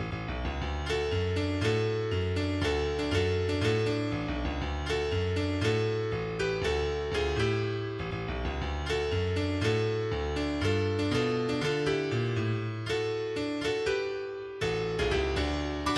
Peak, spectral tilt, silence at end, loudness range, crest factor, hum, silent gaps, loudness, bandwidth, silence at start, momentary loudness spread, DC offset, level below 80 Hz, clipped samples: -16 dBFS; -6 dB/octave; 0 s; 2 LU; 14 dB; none; none; -30 LUFS; 12 kHz; 0 s; 5 LU; under 0.1%; -42 dBFS; under 0.1%